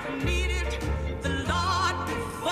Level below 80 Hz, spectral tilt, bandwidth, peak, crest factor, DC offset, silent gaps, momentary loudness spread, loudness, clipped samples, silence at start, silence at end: -34 dBFS; -4.5 dB/octave; 14.5 kHz; -14 dBFS; 14 dB; under 0.1%; none; 5 LU; -28 LUFS; under 0.1%; 0 s; 0 s